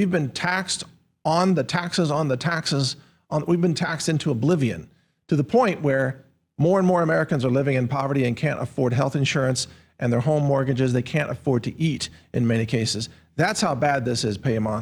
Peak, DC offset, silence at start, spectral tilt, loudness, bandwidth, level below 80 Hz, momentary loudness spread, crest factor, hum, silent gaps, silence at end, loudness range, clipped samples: -8 dBFS; under 0.1%; 0 s; -5.5 dB/octave; -23 LUFS; 19 kHz; -58 dBFS; 7 LU; 14 dB; none; none; 0 s; 2 LU; under 0.1%